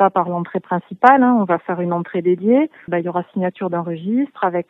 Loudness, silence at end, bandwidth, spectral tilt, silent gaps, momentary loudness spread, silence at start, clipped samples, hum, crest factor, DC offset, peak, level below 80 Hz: -18 LUFS; 0.1 s; 5.2 kHz; -9.5 dB/octave; none; 10 LU; 0 s; under 0.1%; none; 18 dB; under 0.1%; 0 dBFS; -70 dBFS